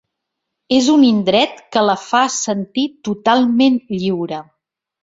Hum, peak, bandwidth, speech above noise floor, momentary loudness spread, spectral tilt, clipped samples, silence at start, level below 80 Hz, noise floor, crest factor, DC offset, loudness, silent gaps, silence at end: none; -2 dBFS; 7.8 kHz; 63 dB; 9 LU; -4 dB/octave; under 0.1%; 0.7 s; -58 dBFS; -78 dBFS; 14 dB; under 0.1%; -16 LUFS; none; 0.6 s